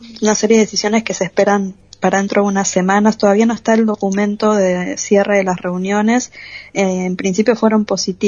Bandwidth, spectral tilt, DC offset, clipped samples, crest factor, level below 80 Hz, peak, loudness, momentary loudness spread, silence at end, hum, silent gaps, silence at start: 7.4 kHz; -4.5 dB/octave; under 0.1%; under 0.1%; 14 dB; -54 dBFS; 0 dBFS; -15 LUFS; 6 LU; 0 s; none; none; 0 s